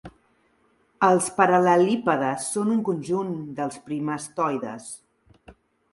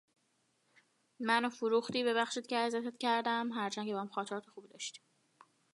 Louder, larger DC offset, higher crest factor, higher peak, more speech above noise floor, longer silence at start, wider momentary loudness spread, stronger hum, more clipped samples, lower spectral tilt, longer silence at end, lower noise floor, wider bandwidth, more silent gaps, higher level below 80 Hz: first, -23 LUFS vs -35 LUFS; neither; about the same, 20 dB vs 22 dB; first, -4 dBFS vs -16 dBFS; about the same, 42 dB vs 42 dB; second, 0.05 s vs 1.2 s; about the same, 13 LU vs 12 LU; neither; neither; first, -5 dB/octave vs -3.5 dB/octave; second, 0.4 s vs 0.75 s; second, -64 dBFS vs -77 dBFS; about the same, 11.5 kHz vs 11.5 kHz; neither; first, -64 dBFS vs -88 dBFS